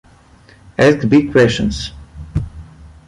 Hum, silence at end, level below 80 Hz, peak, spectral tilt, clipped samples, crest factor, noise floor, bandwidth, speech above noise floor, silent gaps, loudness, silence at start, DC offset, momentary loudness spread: none; 0.2 s; -34 dBFS; -2 dBFS; -6 dB/octave; under 0.1%; 16 dB; -46 dBFS; 11.5 kHz; 33 dB; none; -15 LUFS; 0.8 s; under 0.1%; 17 LU